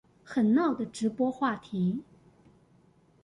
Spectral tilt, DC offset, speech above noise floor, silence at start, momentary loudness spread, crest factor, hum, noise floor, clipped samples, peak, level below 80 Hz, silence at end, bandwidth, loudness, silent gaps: -7 dB/octave; under 0.1%; 35 dB; 0.25 s; 7 LU; 16 dB; none; -63 dBFS; under 0.1%; -14 dBFS; -68 dBFS; 1.2 s; 11 kHz; -29 LUFS; none